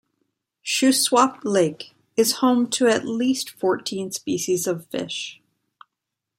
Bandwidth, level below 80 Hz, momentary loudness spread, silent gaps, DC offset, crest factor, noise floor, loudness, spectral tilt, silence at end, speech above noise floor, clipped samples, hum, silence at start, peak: 16.5 kHz; -72 dBFS; 11 LU; none; under 0.1%; 20 dB; -83 dBFS; -22 LUFS; -3 dB/octave; 1.05 s; 62 dB; under 0.1%; none; 0.65 s; -2 dBFS